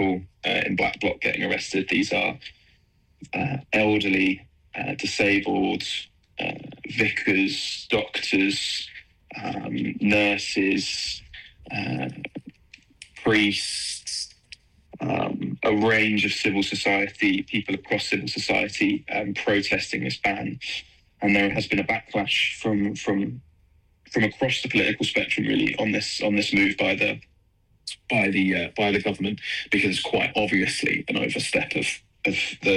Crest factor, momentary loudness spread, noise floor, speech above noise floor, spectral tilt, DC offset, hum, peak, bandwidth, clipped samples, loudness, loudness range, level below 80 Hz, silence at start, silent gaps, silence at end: 16 dB; 11 LU; -62 dBFS; 38 dB; -4 dB/octave; under 0.1%; none; -10 dBFS; 12.5 kHz; under 0.1%; -24 LUFS; 3 LU; -56 dBFS; 0 s; none; 0 s